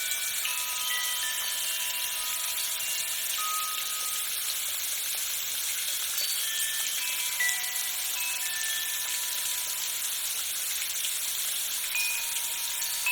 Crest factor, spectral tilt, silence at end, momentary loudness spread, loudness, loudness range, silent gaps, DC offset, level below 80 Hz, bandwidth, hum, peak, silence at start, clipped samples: 20 dB; 4 dB/octave; 0 s; 2 LU; -27 LUFS; 1 LU; none; under 0.1%; -68 dBFS; 19.5 kHz; none; -10 dBFS; 0 s; under 0.1%